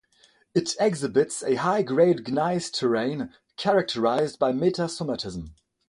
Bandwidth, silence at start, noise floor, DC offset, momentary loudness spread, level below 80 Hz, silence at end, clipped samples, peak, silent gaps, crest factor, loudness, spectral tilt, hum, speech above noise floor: 11.5 kHz; 0.55 s; -61 dBFS; under 0.1%; 10 LU; -58 dBFS; 0.35 s; under 0.1%; -8 dBFS; none; 18 dB; -25 LUFS; -5 dB/octave; none; 37 dB